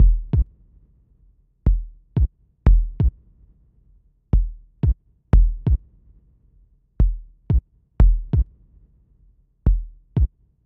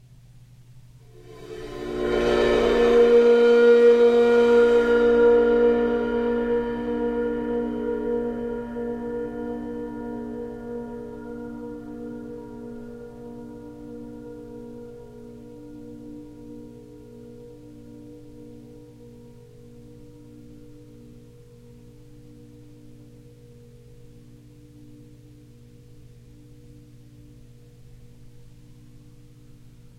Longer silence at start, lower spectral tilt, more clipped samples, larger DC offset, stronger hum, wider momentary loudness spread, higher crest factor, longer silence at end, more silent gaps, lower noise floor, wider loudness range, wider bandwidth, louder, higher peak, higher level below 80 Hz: second, 0 s vs 0.75 s; first, -11.5 dB/octave vs -6 dB/octave; neither; neither; neither; second, 8 LU vs 28 LU; about the same, 18 dB vs 18 dB; about the same, 0.4 s vs 0.3 s; neither; first, -57 dBFS vs -49 dBFS; second, 2 LU vs 26 LU; second, 2.3 kHz vs 8.8 kHz; about the same, -23 LUFS vs -21 LUFS; first, -2 dBFS vs -8 dBFS; first, -22 dBFS vs -48 dBFS